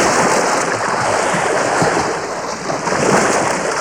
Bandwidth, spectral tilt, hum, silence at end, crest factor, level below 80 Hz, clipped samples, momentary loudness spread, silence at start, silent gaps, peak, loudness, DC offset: 20 kHz; -3 dB/octave; none; 0 s; 12 dB; -48 dBFS; under 0.1%; 8 LU; 0 s; none; -4 dBFS; -16 LUFS; 0.2%